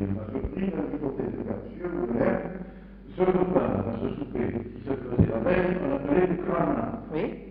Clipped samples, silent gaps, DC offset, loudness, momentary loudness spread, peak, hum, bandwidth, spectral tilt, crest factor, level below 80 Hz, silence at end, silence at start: under 0.1%; none; under 0.1%; -28 LUFS; 10 LU; -8 dBFS; none; 4.8 kHz; -8 dB/octave; 20 dB; -44 dBFS; 0 s; 0 s